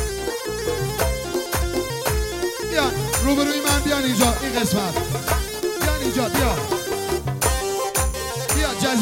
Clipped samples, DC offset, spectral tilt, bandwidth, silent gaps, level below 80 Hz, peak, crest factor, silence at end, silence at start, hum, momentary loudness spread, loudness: under 0.1%; under 0.1%; -4 dB/octave; 16.5 kHz; none; -30 dBFS; -2 dBFS; 18 dB; 0 s; 0 s; none; 6 LU; -22 LUFS